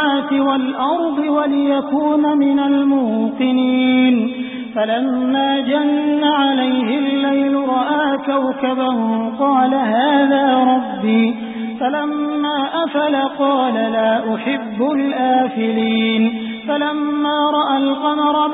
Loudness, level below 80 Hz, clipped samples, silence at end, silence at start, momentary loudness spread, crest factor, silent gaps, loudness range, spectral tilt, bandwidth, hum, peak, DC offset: -16 LUFS; -62 dBFS; under 0.1%; 0 s; 0 s; 5 LU; 12 dB; none; 2 LU; -10.5 dB/octave; 4 kHz; none; -4 dBFS; under 0.1%